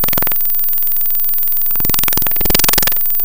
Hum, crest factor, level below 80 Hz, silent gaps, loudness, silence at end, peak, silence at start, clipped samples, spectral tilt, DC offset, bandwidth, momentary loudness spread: none; 16 dB; -32 dBFS; none; -11 LUFS; 0 s; 0 dBFS; 0 s; 0.1%; -2 dB/octave; 10%; over 20 kHz; 2 LU